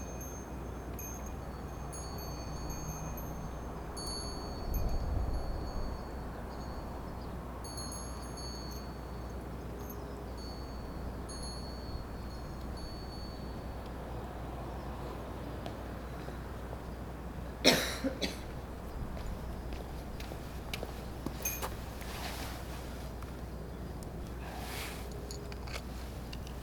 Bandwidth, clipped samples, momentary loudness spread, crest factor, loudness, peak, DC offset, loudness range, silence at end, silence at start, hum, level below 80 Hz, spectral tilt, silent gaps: over 20 kHz; under 0.1%; 7 LU; 32 dB; -40 LUFS; -8 dBFS; under 0.1%; 8 LU; 0 s; 0 s; none; -44 dBFS; -4 dB/octave; none